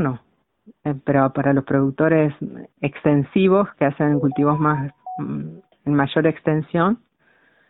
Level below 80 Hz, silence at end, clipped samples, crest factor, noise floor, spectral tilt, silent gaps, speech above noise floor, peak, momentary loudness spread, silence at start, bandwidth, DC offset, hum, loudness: -54 dBFS; 0.75 s; under 0.1%; 18 dB; -59 dBFS; -12.5 dB/octave; none; 40 dB; -2 dBFS; 13 LU; 0 s; 4.1 kHz; under 0.1%; none; -20 LUFS